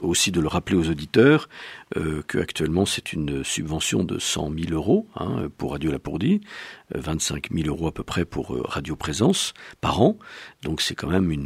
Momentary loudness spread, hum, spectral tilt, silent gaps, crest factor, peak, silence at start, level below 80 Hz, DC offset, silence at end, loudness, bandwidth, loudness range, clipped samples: 9 LU; none; -4.5 dB/octave; none; 20 dB; -4 dBFS; 0 s; -42 dBFS; under 0.1%; 0 s; -24 LUFS; 16 kHz; 4 LU; under 0.1%